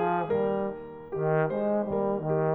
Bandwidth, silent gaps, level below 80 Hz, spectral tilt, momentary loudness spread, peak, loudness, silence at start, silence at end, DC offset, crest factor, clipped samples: 4 kHz; none; -60 dBFS; -11.5 dB/octave; 8 LU; -14 dBFS; -28 LUFS; 0 s; 0 s; under 0.1%; 14 dB; under 0.1%